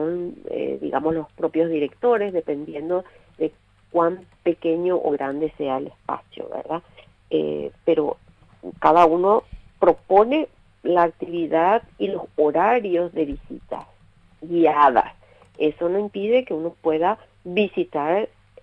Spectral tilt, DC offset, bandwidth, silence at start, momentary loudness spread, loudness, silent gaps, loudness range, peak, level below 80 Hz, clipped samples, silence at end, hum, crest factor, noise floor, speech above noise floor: -8 dB/octave; under 0.1%; 6.2 kHz; 0 s; 14 LU; -22 LUFS; none; 6 LU; -2 dBFS; -52 dBFS; under 0.1%; 0.35 s; none; 20 dB; -52 dBFS; 31 dB